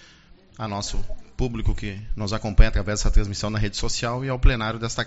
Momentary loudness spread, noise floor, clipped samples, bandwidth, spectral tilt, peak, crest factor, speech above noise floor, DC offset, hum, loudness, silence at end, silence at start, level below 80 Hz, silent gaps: 10 LU; -51 dBFS; under 0.1%; 8 kHz; -4.5 dB/octave; -2 dBFS; 20 dB; 30 dB; under 0.1%; none; -26 LUFS; 0 s; 0.6 s; -24 dBFS; none